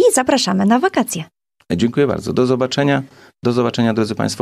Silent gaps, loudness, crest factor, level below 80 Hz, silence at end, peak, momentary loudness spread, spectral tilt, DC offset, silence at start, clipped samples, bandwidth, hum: none; -17 LUFS; 14 dB; -52 dBFS; 0 s; -2 dBFS; 9 LU; -5 dB/octave; under 0.1%; 0 s; under 0.1%; 15.5 kHz; none